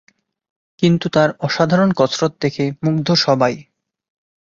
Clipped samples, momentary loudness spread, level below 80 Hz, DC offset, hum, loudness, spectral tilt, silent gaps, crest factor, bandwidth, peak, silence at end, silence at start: under 0.1%; 6 LU; -56 dBFS; under 0.1%; none; -17 LUFS; -6 dB/octave; none; 16 dB; 7.6 kHz; -2 dBFS; 0.8 s; 0.8 s